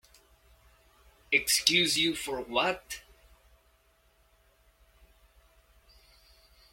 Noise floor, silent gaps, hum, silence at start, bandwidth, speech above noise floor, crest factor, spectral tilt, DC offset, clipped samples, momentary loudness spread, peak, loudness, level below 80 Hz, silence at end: -67 dBFS; none; none; 1.3 s; 16.5 kHz; 38 dB; 32 dB; -1.5 dB/octave; under 0.1%; under 0.1%; 16 LU; -4 dBFS; -26 LUFS; -62 dBFS; 3.7 s